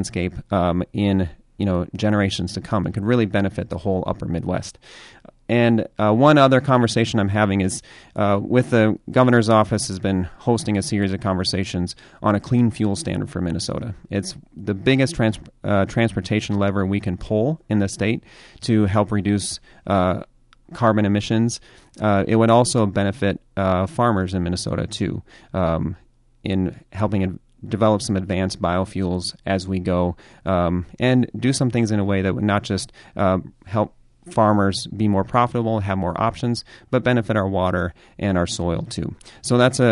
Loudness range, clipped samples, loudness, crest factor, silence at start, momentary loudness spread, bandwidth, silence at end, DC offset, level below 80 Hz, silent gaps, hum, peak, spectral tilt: 5 LU; under 0.1%; -21 LUFS; 18 dB; 0 s; 10 LU; 11.5 kHz; 0 s; under 0.1%; -40 dBFS; none; none; -2 dBFS; -6 dB/octave